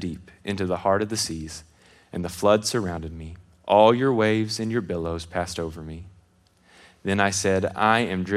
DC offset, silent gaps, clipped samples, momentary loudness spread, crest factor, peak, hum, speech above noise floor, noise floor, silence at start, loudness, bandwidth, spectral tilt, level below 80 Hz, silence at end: under 0.1%; none; under 0.1%; 19 LU; 22 dB; -4 dBFS; none; 37 dB; -60 dBFS; 0 s; -23 LUFS; 15 kHz; -4.5 dB/octave; -52 dBFS; 0 s